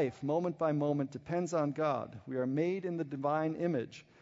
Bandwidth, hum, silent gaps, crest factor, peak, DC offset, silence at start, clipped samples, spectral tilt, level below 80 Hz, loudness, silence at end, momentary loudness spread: 7.6 kHz; none; none; 14 dB; -20 dBFS; under 0.1%; 0 s; under 0.1%; -7.5 dB/octave; -74 dBFS; -34 LUFS; 0.2 s; 6 LU